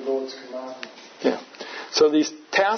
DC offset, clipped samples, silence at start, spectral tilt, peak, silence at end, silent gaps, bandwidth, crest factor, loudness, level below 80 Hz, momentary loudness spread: under 0.1%; under 0.1%; 0 s; -2.5 dB/octave; -6 dBFS; 0 s; none; 6.6 kHz; 18 dB; -23 LUFS; -74 dBFS; 17 LU